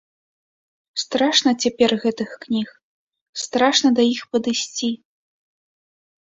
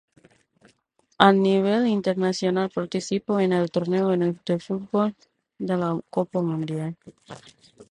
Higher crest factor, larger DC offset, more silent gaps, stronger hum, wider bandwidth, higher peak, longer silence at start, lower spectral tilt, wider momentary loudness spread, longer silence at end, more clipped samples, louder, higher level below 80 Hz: about the same, 20 dB vs 24 dB; neither; first, 2.83-3.11 s, 3.21-3.33 s vs none; neither; second, 7.8 kHz vs 10.5 kHz; second, -4 dBFS vs 0 dBFS; second, 0.95 s vs 1.2 s; second, -2.5 dB/octave vs -6.5 dB/octave; about the same, 14 LU vs 15 LU; first, 1.35 s vs 0.1 s; neither; first, -20 LUFS vs -24 LUFS; about the same, -64 dBFS vs -66 dBFS